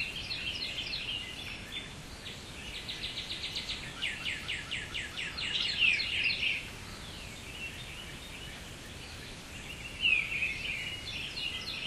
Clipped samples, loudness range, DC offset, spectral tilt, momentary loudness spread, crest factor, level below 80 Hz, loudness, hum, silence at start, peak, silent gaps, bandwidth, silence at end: under 0.1%; 7 LU; under 0.1%; -2 dB/octave; 16 LU; 20 dB; -52 dBFS; -34 LUFS; none; 0 s; -16 dBFS; none; 15.5 kHz; 0 s